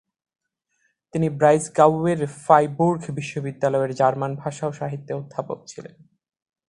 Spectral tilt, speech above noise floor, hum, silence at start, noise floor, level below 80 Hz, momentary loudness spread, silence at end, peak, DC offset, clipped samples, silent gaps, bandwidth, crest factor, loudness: -6.5 dB/octave; 50 dB; none; 1.15 s; -71 dBFS; -60 dBFS; 14 LU; 0.8 s; 0 dBFS; under 0.1%; under 0.1%; none; 11 kHz; 22 dB; -22 LUFS